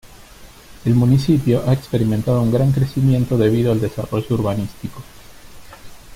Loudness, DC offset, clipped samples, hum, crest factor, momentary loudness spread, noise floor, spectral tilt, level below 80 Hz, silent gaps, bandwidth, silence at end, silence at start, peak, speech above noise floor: -18 LUFS; under 0.1%; under 0.1%; none; 14 dB; 10 LU; -41 dBFS; -8 dB/octave; -42 dBFS; none; 16 kHz; 0 s; 0.15 s; -4 dBFS; 25 dB